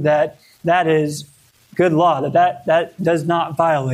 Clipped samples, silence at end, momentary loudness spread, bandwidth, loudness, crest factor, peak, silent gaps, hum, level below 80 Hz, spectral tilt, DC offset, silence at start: under 0.1%; 0 s; 9 LU; 15 kHz; -17 LUFS; 14 dB; -2 dBFS; none; none; -60 dBFS; -6.5 dB/octave; under 0.1%; 0 s